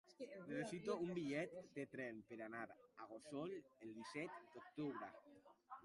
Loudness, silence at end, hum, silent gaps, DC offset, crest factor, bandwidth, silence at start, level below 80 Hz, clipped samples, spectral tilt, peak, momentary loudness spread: -51 LUFS; 0 s; none; none; under 0.1%; 20 dB; 11.5 kHz; 0.05 s; -86 dBFS; under 0.1%; -6 dB/octave; -32 dBFS; 13 LU